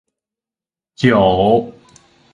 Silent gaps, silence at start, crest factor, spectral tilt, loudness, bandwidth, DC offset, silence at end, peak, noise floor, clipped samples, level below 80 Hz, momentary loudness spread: none; 1 s; 18 dB; -7 dB/octave; -14 LUFS; 11 kHz; under 0.1%; 0.65 s; 0 dBFS; under -90 dBFS; under 0.1%; -44 dBFS; 7 LU